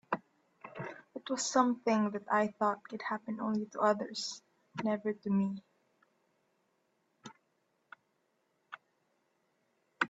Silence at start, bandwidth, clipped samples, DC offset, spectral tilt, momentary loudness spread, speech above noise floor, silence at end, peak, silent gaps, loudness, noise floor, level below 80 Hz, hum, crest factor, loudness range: 0.1 s; 8.4 kHz; under 0.1%; under 0.1%; -4.5 dB/octave; 23 LU; 45 dB; 0 s; -12 dBFS; none; -34 LUFS; -78 dBFS; -82 dBFS; none; 24 dB; 8 LU